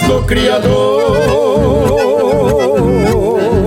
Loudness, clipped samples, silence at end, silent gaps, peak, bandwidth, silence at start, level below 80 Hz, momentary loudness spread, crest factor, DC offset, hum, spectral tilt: -11 LUFS; under 0.1%; 0 s; none; 0 dBFS; 16.5 kHz; 0 s; -24 dBFS; 1 LU; 10 dB; under 0.1%; none; -6 dB/octave